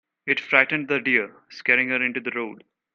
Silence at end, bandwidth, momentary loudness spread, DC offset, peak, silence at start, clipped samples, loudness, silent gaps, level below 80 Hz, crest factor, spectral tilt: 0.4 s; 7.2 kHz; 12 LU; under 0.1%; -2 dBFS; 0.25 s; under 0.1%; -21 LUFS; none; -74 dBFS; 22 dB; -5.5 dB/octave